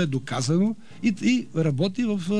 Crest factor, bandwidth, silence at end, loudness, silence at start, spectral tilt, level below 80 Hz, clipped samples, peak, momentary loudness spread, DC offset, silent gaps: 14 dB; 11 kHz; 0 s; -25 LUFS; 0 s; -6 dB/octave; -62 dBFS; under 0.1%; -10 dBFS; 4 LU; 0.8%; none